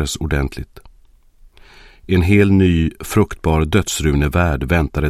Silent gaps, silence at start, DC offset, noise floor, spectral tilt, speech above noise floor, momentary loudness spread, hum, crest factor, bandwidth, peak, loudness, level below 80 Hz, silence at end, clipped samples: none; 0 s; under 0.1%; -48 dBFS; -6 dB/octave; 33 dB; 8 LU; none; 16 dB; 15.5 kHz; 0 dBFS; -16 LUFS; -26 dBFS; 0 s; under 0.1%